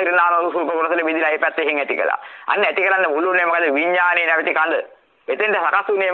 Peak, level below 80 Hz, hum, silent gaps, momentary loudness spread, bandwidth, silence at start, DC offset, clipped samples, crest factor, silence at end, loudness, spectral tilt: -4 dBFS; -76 dBFS; none; none; 7 LU; 6.4 kHz; 0 s; under 0.1%; under 0.1%; 16 dB; 0 s; -18 LUFS; -5 dB/octave